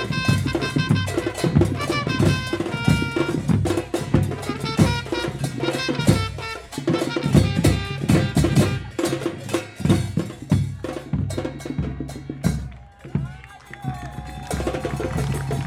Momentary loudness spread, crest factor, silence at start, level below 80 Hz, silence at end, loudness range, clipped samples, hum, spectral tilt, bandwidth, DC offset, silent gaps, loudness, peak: 12 LU; 18 dB; 0 s; -36 dBFS; 0 s; 8 LU; under 0.1%; none; -6 dB/octave; 15.5 kHz; under 0.1%; none; -23 LUFS; -4 dBFS